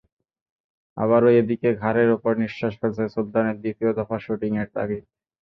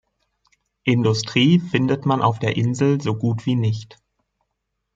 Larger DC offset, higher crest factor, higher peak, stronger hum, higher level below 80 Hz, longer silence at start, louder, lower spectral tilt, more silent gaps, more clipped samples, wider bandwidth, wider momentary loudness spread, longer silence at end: neither; about the same, 18 dB vs 18 dB; about the same, -4 dBFS vs -4 dBFS; neither; about the same, -58 dBFS vs -58 dBFS; about the same, 0.95 s vs 0.85 s; about the same, -22 LUFS vs -20 LUFS; first, -9.5 dB/octave vs -6.5 dB/octave; neither; neither; second, 6 kHz vs 7.8 kHz; first, 10 LU vs 6 LU; second, 0.4 s vs 1.1 s